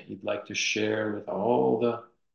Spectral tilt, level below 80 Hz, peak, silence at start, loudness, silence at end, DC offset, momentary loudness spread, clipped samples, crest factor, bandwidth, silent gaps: -4 dB/octave; -70 dBFS; -12 dBFS; 0 s; -28 LUFS; 0.3 s; under 0.1%; 9 LU; under 0.1%; 18 dB; 7.4 kHz; none